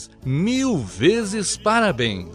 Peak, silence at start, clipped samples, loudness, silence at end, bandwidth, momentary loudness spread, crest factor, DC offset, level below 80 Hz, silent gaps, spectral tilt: -4 dBFS; 0 s; under 0.1%; -20 LUFS; 0 s; 13.5 kHz; 5 LU; 16 dB; under 0.1%; -46 dBFS; none; -4.5 dB/octave